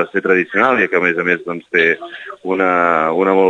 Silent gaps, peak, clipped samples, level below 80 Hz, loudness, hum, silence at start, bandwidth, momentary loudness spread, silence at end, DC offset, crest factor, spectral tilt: none; 0 dBFS; under 0.1%; -68 dBFS; -15 LUFS; none; 0 s; 7.6 kHz; 9 LU; 0 s; under 0.1%; 14 dB; -6.5 dB/octave